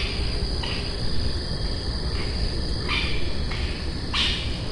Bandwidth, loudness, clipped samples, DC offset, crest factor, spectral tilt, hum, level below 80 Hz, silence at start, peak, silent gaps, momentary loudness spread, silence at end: 11.5 kHz; -27 LUFS; under 0.1%; under 0.1%; 16 dB; -4.5 dB/octave; none; -30 dBFS; 0 s; -10 dBFS; none; 5 LU; 0 s